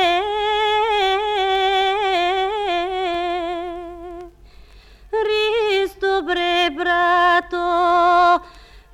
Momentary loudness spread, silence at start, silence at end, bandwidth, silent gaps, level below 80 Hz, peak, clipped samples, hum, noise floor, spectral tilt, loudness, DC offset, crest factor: 11 LU; 0 s; 0.15 s; 13.5 kHz; none; -46 dBFS; -4 dBFS; under 0.1%; none; -45 dBFS; -3 dB/octave; -18 LUFS; under 0.1%; 14 dB